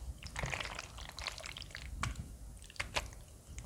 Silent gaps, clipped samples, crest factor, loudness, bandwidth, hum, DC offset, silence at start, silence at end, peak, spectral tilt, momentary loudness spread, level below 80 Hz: none; under 0.1%; 26 dB; -43 LUFS; 18 kHz; none; under 0.1%; 0 s; 0 s; -18 dBFS; -3 dB/octave; 12 LU; -50 dBFS